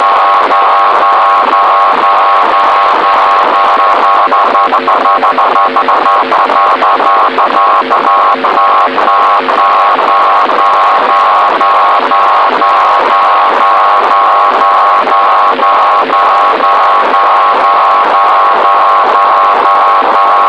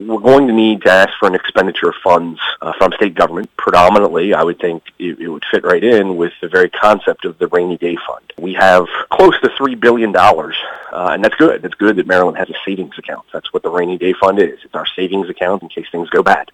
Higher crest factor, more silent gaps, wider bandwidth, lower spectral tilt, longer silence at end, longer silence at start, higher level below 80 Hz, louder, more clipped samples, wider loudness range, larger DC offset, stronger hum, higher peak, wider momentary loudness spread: second, 6 dB vs 12 dB; neither; second, 9.6 kHz vs 14.5 kHz; second, -3 dB/octave vs -5.5 dB/octave; about the same, 0 s vs 0.1 s; about the same, 0 s vs 0 s; second, -60 dBFS vs -46 dBFS; first, -6 LUFS vs -13 LUFS; about the same, 0.4% vs 0.5%; second, 1 LU vs 4 LU; first, 0.5% vs under 0.1%; neither; about the same, 0 dBFS vs 0 dBFS; second, 1 LU vs 13 LU